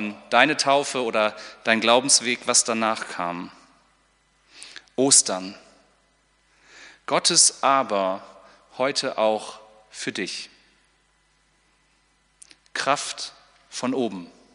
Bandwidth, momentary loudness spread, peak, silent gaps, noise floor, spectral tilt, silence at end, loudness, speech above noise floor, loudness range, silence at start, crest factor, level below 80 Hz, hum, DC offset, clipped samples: 10.5 kHz; 20 LU; -2 dBFS; none; -64 dBFS; -1 dB/octave; 0.3 s; -21 LUFS; 42 dB; 11 LU; 0 s; 24 dB; -72 dBFS; none; under 0.1%; under 0.1%